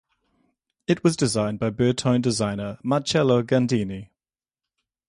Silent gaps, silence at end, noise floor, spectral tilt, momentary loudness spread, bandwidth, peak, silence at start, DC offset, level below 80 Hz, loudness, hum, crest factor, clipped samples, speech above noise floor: none; 1.05 s; under -90 dBFS; -5.5 dB/octave; 9 LU; 11.5 kHz; -6 dBFS; 0.9 s; under 0.1%; -56 dBFS; -23 LUFS; none; 18 dB; under 0.1%; over 68 dB